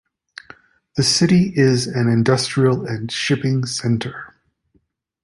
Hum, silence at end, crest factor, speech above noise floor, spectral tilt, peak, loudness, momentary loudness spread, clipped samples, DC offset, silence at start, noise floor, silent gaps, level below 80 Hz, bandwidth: none; 0.95 s; 16 dB; 47 dB; -5 dB/octave; -2 dBFS; -18 LUFS; 14 LU; under 0.1%; under 0.1%; 0.95 s; -64 dBFS; none; -52 dBFS; 11.5 kHz